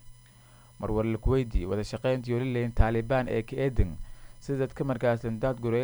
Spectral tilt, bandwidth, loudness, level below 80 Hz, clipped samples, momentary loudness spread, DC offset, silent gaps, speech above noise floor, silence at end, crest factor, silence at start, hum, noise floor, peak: -8 dB/octave; over 20 kHz; -29 LUFS; -36 dBFS; under 0.1%; 5 LU; under 0.1%; none; 27 dB; 0 s; 22 dB; 0.05 s; none; -54 dBFS; -6 dBFS